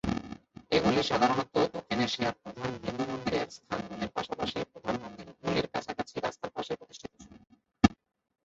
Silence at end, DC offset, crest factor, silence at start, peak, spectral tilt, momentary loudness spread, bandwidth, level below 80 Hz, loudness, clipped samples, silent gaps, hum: 0.5 s; under 0.1%; 28 dB; 0.05 s; -6 dBFS; -5 dB/octave; 12 LU; 8 kHz; -54 dBFS; -32 LUFS; under 0.1%; none; none